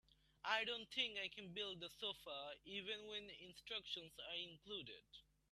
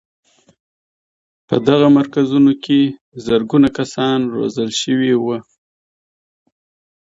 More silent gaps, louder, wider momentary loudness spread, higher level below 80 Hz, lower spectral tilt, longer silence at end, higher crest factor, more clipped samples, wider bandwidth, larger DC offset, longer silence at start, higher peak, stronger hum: second, none vs 3.01-3.12 s; second, -47 LUFS vs -15 LUFS; first, 15 LU vs 8 LU; second, -80 dBFS vs -54 dBFS; second, -2.5 dB/octave vs -6 dB/octave; second, 0.3 s vs 1.65 s; first, 24 dB vs 16 dB; neither; first, 13.5 kHz vs 7.8 kHz; neither; second, 0.1 s vs 1.5 s; second, -26 dBFS vs 0 dBFS; neither